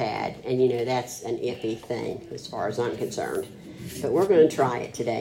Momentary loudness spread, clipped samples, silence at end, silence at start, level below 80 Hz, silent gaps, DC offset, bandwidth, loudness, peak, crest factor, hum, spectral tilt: 14 LU; under 0.1%; 0 s; 0 s; -62 dBFS; none; under 0.1%; 16 kHz; -26 LUFS; -8 dBFS; 18 dB; none; -5.5 dB/octave